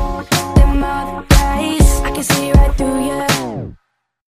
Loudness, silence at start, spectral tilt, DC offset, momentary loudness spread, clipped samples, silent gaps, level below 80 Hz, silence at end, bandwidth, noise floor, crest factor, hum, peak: -15 LUFS; 0 s; -5 dB/octave; under 0.1%; 8 LU; under 0.1%; none; -16 dBFS; 0.5 s; 15.5 kHz; -65 dBFS; 14 dB; none; 0 dBFS